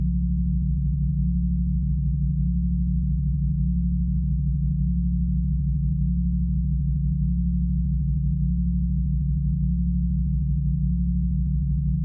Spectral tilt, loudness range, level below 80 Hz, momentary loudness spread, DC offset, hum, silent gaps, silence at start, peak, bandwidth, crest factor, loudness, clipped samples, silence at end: -17 dB/octave; 0 LU; -26 dBFS; 1 LU; under 0.1%; none; none; 0 s; -14 dBFS; 0.4 kHz; 10 dB; -25 LUFS; under 0.1%; 0 s